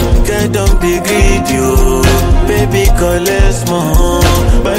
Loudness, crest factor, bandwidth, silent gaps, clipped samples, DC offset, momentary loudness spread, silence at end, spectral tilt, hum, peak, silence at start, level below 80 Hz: -11 LUFS; 8 dB; 16.5 kHz; none; under 0.1%; under 0.1%; 2 LU; 0 s; -5 dB/octave; none; 0 dBFS; 0 s; -12 dBFS